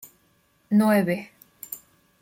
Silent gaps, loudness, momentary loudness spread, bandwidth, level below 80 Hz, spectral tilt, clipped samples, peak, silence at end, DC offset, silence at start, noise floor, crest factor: none; -22 LUFS; 23 LU; 17 kHz; -68 dBFS; -6.5 dB/octave; under 0.1%; -10 dBFS; 0.45 s; under 0.1%; 0.7 s; -64 dBFS; 16 dB